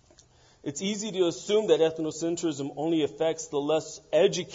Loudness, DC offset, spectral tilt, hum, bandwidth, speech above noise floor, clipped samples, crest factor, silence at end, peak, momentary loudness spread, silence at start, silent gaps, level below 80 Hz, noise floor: -27 LUFS; under 0.1%; -4.5 dB/octave; none; 7.8 kHz; 32 dB; under 0.1%; 18 dB; 0 s; -10 dBFS; 8 LU; 0.65 s; none; -68 dBFS; -59 dBFS